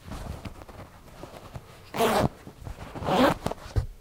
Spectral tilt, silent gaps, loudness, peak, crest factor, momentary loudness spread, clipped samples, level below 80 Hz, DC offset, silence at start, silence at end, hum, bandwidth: -5.5 dB/octave; none; -27 LUFS; -8 dBFS; 22 dB; 22 LU; under 0.1%; -42 dBFS; under 0.1%; 0.05 s; 0 s; none; 16.5 kHz